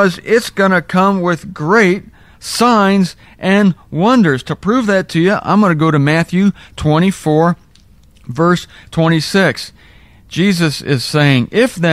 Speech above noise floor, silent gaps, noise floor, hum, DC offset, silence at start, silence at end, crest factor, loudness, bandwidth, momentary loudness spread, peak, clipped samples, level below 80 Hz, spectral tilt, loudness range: 33 dB; none; -46 dBFS; none; 0.3%; 0 s; 0 s; 14 dB; -13 LUFS; 15 kHz; 9 LU; 0 dBFS; under 0.1%; -44 dBFS; -6 dB/octave; 3 LU